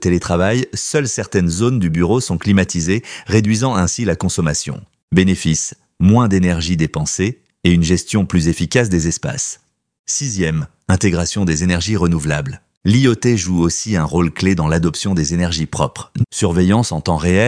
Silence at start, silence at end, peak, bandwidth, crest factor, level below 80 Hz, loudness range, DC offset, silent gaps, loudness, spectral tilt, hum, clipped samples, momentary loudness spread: 0 s; 0 s; 0 dBFS; 10.5 kHz; 16 dB; -36 dBFS; 2 LU; under 0.1%; 5.03-5.08 s, 9.99-10.04 s, 12.77-12.81 s; -16 LUFS; -5 dB/octave; none; under 0.1%; 7 LU